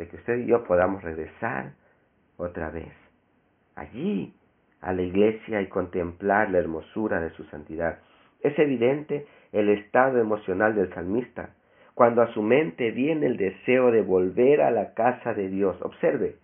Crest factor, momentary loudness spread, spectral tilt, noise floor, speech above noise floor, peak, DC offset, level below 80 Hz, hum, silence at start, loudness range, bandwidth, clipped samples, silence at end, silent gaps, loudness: 22 dB; 14 LU; -2.5 dB/octave; -66 dBFS; 42 dB; -2 dBFS; under 0.1%; -58 dBFS; none; 0 s; 10 LU; 3.6 kHz; under 0.1%; 0.1 s; none; -25 LUFS